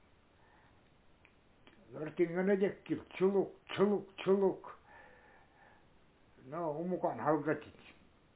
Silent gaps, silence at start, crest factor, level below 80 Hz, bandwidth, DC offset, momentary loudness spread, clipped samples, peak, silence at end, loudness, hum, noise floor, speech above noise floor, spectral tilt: none; 1.9 s; 20 dB; -72 dBFS; 4 kHz; under 0.1%; 15 LU; under 0.1%; -18 dBFS; 0.45 s; -35 LUFS; none; -66 dBFS; 31 dB; -6 dB/octave